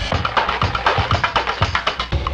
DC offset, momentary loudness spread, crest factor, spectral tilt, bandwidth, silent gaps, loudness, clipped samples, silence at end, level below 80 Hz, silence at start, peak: under 0.1%; 3 LU; 18 dB; -4.5 dB/octave; 9 kHz; none; -19 LUFS; under 0.1%; 0 s; -30 dBFS; 0 s; 0 dBFS